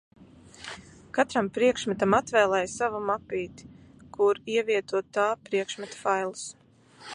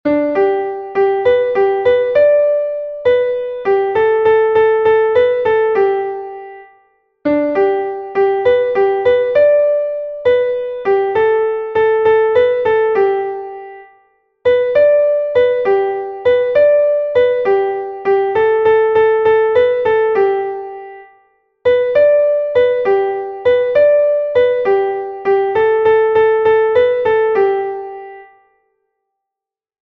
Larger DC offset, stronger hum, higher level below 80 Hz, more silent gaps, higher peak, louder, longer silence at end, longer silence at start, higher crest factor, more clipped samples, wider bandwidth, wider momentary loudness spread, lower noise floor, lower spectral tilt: neither; neither; second, -62 dBFS vs -52 dBFS; neither; second, -8 dBFS vs -2 dBFS; second, -27 LUFS vs -14 LUFS; second, 0 s vs 1.6 s; first, 0.2 s vs 0.05 s; first, 20 dB vs 12 dB; neither; first, 11 kHz vs 5.2 kHz; first, 18 LU vs 8 LU; second, -50 dBFS vs -86 dBFS; second, -4 dB/octave vs -7 dB/octave